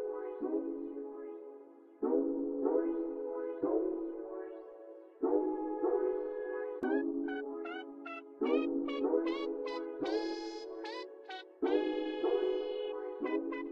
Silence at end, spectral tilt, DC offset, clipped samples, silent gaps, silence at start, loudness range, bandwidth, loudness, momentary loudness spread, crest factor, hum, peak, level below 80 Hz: 0 s; -5 dB/octave; under 0.1%; under 0.1%; none; 0 s; 1 LU; 7.2 kHz; -36 LUFS; 13 LU; 18 dB; none; -18 dBFS; -74 dBFS